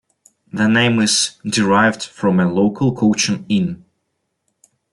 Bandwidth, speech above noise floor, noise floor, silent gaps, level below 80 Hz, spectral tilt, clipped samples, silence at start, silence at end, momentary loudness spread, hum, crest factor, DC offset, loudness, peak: 11.5 kHz; 56 dB; -72 dBFS; none; -56 dBFS; -4 dB/octave; under 0.1%; 0.55 s; 1.2 s; 6 LU; none; 16 dB; under 0.1%; -16 LUFS; -2 dBFS